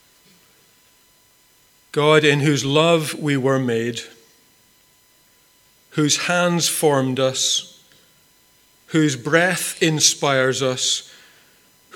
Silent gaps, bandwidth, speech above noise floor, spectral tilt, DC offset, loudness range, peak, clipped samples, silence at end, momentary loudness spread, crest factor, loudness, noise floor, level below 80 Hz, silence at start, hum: none; 19 kHz; 38 dB; -3.5 dB/octave; under 0.1%; 4 LU; 0 dBFS; under 0.1%; 0.9 s; 9 LU; 20 dB; -18 LUFS; -56 dBFS; -66 dBFS; 1.95 s; none